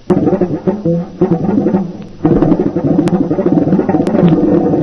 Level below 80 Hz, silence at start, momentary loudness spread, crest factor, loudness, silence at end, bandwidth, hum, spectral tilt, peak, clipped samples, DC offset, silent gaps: -34 dBFS; 0.05 s; 5 LU; 12 dB; -13 LUFS; 0 s; 7 kHz; none; -10 dB/octave; 0 dBFS; under 0.1%; 0.3%; none